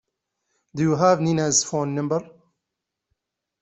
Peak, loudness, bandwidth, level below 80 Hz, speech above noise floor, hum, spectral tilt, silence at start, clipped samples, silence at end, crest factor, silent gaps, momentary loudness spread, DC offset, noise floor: -4 dBFS; -21 LUFS; 8.2 kHz; -62 dBFS; 62 dB; none; -4.5 dB/octave; 0.75 s; under 0.1%; 1.35 s; 20 dB; none; 9 LU; under 0.1%; -83 dBFS